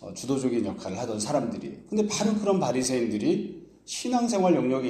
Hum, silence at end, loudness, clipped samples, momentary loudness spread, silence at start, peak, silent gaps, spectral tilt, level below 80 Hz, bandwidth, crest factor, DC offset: none; 0 s; -27 LUFS; under 0.1%; 10 LU; 0 s; -10 dBFS; none; -5 dB/octave; -62 dBFS; 14.5 kHz; 16 dB; under 0.1%